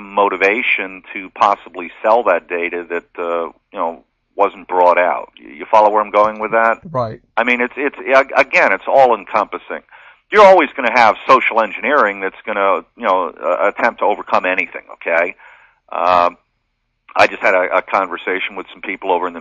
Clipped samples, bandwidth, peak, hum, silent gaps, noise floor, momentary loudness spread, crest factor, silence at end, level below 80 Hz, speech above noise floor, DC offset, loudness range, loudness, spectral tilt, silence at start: under 0.1%; 8.6 kHz; 0 dBFS; none; none; -69 dBFS; 12 LU; 16 dB; 0 s; -58 dBFS; 53 dB; under 0.1%; 6 LU; -15 LUFS; -4.5 dB/octave; 0 s